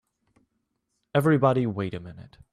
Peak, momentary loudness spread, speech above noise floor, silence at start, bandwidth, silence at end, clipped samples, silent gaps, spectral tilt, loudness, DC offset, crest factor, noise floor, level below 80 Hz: -8 dBFS; 17 LU; 53 dB; 1.15 s; 14.5 kHz; 0.3 s; under 0.1%; none; -8 dB/octave; -24 LUFS; under 0.1%; 18 dB; -78 dBFS; -62 dBFS